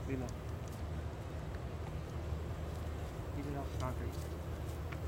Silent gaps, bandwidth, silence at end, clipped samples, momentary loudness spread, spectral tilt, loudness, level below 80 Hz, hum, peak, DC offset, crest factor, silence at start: none; 16 kHz; 0 s; under 0.1%; 4 LU; -7 dB/octave; -43 LUFS; -46 dBFS; none; -26 dBFS; under 0.1%; 16 dB; 0 s